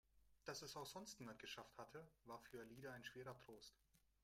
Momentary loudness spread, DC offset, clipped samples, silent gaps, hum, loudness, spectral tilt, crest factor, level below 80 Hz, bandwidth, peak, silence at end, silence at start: 8 LU; under 0.1%; under 0.1%; none; none; -57 LUFS; -3.5 dB/octave; 20 dB; -82 dBFS; 16 kHz; -38 dBFS; 0.25 s; 0.1 s